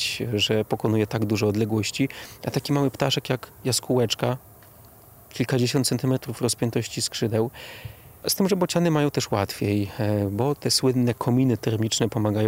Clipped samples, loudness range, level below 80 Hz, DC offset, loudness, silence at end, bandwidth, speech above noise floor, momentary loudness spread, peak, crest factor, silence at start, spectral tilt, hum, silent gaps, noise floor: under 0.1%; 3 LU; -56 dBFS; under 0.1%; -24 LUFS; 0 s; 16 kHz; 26 dB; 8 LU; -6 dBFS; 18 dB; 0 s; -5 dB/octave; none; none; -49 dBFS